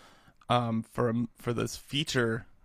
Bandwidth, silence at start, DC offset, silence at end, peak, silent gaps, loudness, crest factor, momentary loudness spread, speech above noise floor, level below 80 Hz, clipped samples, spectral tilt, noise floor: 15.5 kHz; 0.5 s; under 0.1%; 0.2 s; -12 dBFS; none; -31 LUFS; 18 dB; 5 LU; 21 dB; -56 dBFS; under 0.1%; -5 dB/octave; -51 dBFS